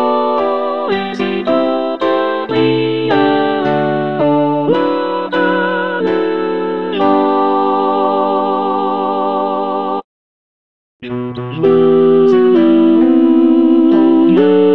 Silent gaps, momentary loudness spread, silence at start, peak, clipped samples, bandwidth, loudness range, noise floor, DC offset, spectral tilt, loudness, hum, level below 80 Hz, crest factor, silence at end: 10.04-11.00 s; 8 LU; 0 s; 0 dBFS; under 0.1%; 5.8 kHz; 6 LU; under -90 dBFS; 0.9%; -8.5 dB/octave; -13 LUFS; none; -56 dBFS; 12 dB; 0 s